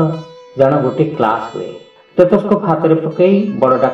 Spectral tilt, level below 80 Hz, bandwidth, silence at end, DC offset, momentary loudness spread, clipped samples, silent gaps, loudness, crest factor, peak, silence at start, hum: -9 dB/octave; -52 dBFS; 7.8 kHz; 0 s; under 0.1%; 14 LU; under 0.1%; none; -14 LUFS; 14 dB; 0 dBFS; 0 s; none